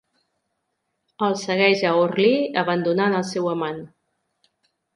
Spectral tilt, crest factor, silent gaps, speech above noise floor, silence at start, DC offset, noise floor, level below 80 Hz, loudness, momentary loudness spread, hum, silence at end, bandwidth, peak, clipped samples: -5.5 dB/octave; 18 dB; none; 56 dB; 1.2 s; under 0.1%; -76 dBFS; -70 dBFS; -21 LUFS; 8 LU; none; 1.1 s; 11.5 kHz; -4 dBFS; under 0.1%